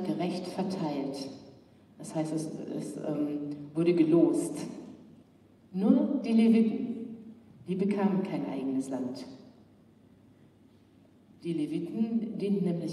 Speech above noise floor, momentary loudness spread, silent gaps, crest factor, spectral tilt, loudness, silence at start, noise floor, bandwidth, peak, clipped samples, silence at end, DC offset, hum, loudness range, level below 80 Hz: 31 dB; 19 LU; none; 20 dB; -7.5 dB/octave; -30 LUFS; 0 s; -60 dBFS; 12 kHz; -10 dBFS; under 0.1%; 0 s; under 0.1%; none; 10 LU; -76 dBFS